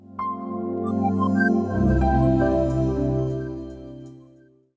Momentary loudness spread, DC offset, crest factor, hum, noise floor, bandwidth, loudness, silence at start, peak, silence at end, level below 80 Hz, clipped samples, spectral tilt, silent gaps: 16 LU; under 0.1%; 14 dB; none; -54 dBFS; 8 kHz; -23 LUFS; 0.05 s; -10 dBFS; 0.55 s; -32 dBFS; under 0.1%; -9.5 dB/octave; none